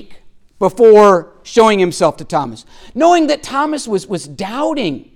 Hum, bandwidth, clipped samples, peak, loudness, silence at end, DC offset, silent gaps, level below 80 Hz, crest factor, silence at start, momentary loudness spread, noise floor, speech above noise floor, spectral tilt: none; 13 kHz; under 0.1%; 0 dBFS; -13 LUFS; 0.15 s; under 0.1%; none; -48 dBFS; 14 dB; 0 s; 14 LU; -36 dBFS; 23 dB; -5 dB/octave